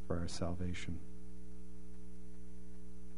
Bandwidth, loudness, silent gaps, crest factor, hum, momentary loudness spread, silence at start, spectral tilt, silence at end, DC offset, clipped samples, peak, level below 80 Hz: 10.5 kHz; -47 LUFS; none; 24 dB; none; 15 LU; 0 s; -6 dB/octave; 0 s; 2%; under 0.1%; -24 dBFS; -54 dBFS